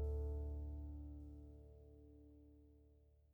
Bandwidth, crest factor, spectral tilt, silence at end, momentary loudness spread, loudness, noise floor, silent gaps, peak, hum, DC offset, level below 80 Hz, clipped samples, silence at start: 1.4 kHz; 14 dB; -11 dB/octave; 0 s; 21 LU; -50 LUFS; -70 dBFS; none; -36 dBFS; none; under 0.1%; -50 dBFS; under 0.1%; 0 s